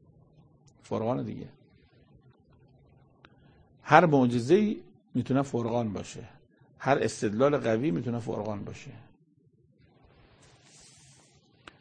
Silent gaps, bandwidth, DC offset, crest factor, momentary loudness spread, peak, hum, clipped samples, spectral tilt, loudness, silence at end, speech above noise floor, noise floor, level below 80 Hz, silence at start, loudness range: none; 9.8 kHz; under 0.1%; 28 dB; 21 LU; -2 dBFS; none; under 0.1%; -6.5 dB/octave; -27 LUFS; 2.85 s; 38 dB; -64 dBFS; -64 dBFS; 0.9 s; 13 LU